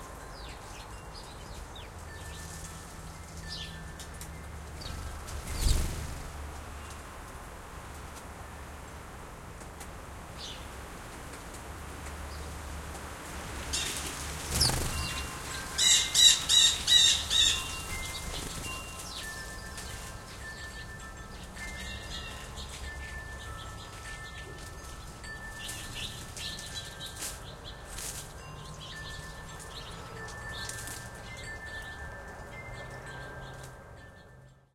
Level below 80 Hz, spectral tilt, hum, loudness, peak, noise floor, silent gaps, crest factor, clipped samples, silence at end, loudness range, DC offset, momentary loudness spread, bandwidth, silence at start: -44 dBFS; -1 dB/octave; none; -30 LUFS; -6 dBFS; -55 dBFS; none; 28 dB; under 0.1%; 0.2 s; 21 LU; under 0.1%; 21 LU; 16.5 kHz; 0 s